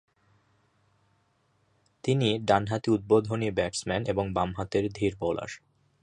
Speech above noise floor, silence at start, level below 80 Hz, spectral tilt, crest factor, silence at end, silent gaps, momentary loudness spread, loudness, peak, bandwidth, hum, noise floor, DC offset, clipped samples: 43 dB; 2.05 s; -54 dBFS; -6 dB/octave; 22 dB; 0.45 s; none; 8 LU; -28 LUFS; -8 dBFS; 10.5 kHz; none; -70 dBFS; under 0.1%; under 0.1%